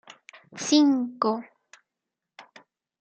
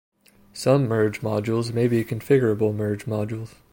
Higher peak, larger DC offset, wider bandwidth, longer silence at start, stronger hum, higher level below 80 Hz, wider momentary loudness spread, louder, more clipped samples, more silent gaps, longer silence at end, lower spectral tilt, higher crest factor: about the same, -8 dBFS vs -6 dBFS; neither; second, 8.8 kHz vs 16.5 kHz; about the same, 0.55 s vs 0.55 s; neither; second, -86 dBFS vs -58 dBFS; first, 14 LU vs 8 LU; about the same, -24 LUFS vs -23 LUFS; neither; neither; first, 0.6 s vs 0.25 s; second, -3 dB/octave vs -7 dB/octave; about the same, 20 dB vs 18 dB